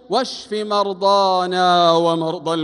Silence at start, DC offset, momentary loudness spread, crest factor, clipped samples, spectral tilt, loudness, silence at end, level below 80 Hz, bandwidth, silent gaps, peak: 0.1 s; under 0.1%; 8 LU; 16 dB; under 0.1%; -4.5 dB/octave; -17 LUFS; 0 s; -66 dBFS; 11.5 kHz; none; -2 dBFS